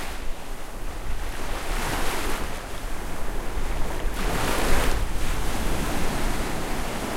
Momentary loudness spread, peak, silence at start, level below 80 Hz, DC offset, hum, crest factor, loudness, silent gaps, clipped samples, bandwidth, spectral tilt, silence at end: 10 LU; -6 dBFS; 0 s; -28 dBFS; under 0.1%; none; 16 dB; -30 LUFS; none; under 0.1%; 16 kHz; -4 dB/octave; 0 s